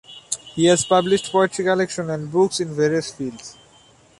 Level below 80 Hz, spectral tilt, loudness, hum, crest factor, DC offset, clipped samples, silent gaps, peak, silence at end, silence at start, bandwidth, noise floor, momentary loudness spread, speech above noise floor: -58 dBFS; -4 dB/octave; -20 LUFS; none; 18 dB; under 0.1%; under 0.1%; none; -4 dBFS; 0.7 s; 0.1 s; 11.5 kHz; -52 dBFS; 13 LU; 33 dB